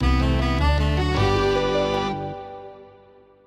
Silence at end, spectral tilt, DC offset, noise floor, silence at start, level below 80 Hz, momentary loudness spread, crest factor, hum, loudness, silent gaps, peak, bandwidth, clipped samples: 0.6 s; -6.5 dB/octave; under 0.1%; -51 dBFS; 0 s; -26 dBFS; 16 LU; 14 dB; 50 Hz at -40 dBFS; -22 LUFS; none; -8 dBFS; 11 kHz; under 0.1%